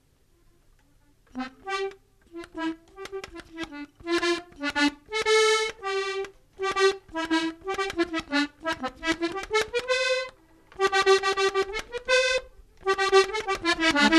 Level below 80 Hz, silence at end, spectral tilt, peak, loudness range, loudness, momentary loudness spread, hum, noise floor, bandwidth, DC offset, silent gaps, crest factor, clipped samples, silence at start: -54 dBFS; 0 s; -2 dB/octave; -6 dBFS; 12 LU; -26 LUFS; 17 LU; none; -61 dBFS; 13 kHz; under 0.1%; none; 22 dB; under 0.1%; 1.35 s